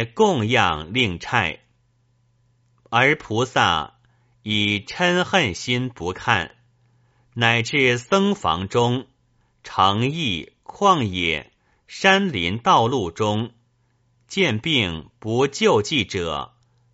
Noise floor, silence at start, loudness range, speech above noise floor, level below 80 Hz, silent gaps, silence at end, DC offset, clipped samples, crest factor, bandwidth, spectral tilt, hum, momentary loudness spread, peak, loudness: -64 dBFS; 0 s; 2 LU; 43 dB; -50 dBFS; none; 0.5 s; under 0.1%; under 0.1%; 22 dB; 8 kHz; -3 dB/octave; none; 11 LU; 0 dBFS; -20 LUFS